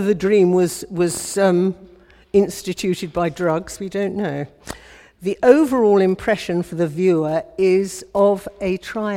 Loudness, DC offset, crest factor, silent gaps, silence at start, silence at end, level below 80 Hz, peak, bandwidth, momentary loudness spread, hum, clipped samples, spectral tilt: -19 LUFS; under 0.1%; 18 dB; none; 0 s; 0 s; -50 dBFS; 0 dBFS; 16.5 kHz; 11 LU; none; under 0.1%; -6 dB/octave